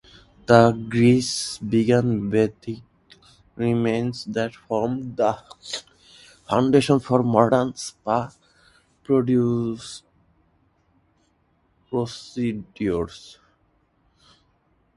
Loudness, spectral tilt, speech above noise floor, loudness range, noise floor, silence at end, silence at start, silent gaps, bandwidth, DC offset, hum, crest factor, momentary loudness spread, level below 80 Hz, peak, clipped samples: -22 LUFS; -6 dB/octave; 44 dB; 9 LU; -65 dBFS; 1.65 s; 0.5 s; none; 11.5 kHz; under 0.1%; none; 24 dB; 15 LU; -54 dBFS; 0 dBFS; under 0.1%